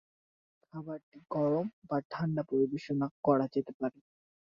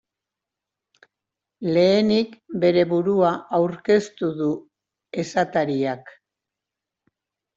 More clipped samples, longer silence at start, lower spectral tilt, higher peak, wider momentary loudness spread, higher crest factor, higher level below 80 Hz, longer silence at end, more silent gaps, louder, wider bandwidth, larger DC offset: neither; second, 0.75 s vs 1.6 s; first, -9.5 dB/octave vs -6.5 dB/octave; second, -12 dBFS vs -6 dBFS; about the same, 14 LU vs 12 LU; about the same, 22 dB vs 18 dB; second, -74 dBFS vs -64 dBFS; second, 0.6 s vs 1.45 s; first, 1.03-1.12 s, 1.73-1.82 s, 2.05-2.10 s, 3.11-3.23 s, 3.74-3.80 s vs none; second, -33 LUFS vs -21 LUFS; about the same, 7.2 kHz vs 7.8 kHz; neither